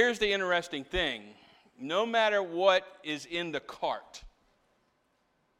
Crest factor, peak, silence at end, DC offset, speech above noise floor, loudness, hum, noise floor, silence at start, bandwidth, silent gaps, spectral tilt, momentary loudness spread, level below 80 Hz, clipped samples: 20 dB; -10 dBFS; 1.3 s; under 0.1%; 43 dB; -30 LUFS; none; -73 dBFS; 0 s; 13.5 kHz; none; -3.5 dB/octave; 14 LU; -56 dBFS; under 0.1%